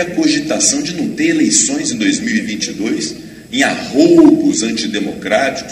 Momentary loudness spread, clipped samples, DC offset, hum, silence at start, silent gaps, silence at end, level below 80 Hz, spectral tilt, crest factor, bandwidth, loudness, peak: 11 LU; under 0.1%; under 0.1%; none; 0 s; none; 0 s; -50 dBFS; -3 dB/octave; 14 dB; 15 kHz; -13 LUFS; 0 dBFS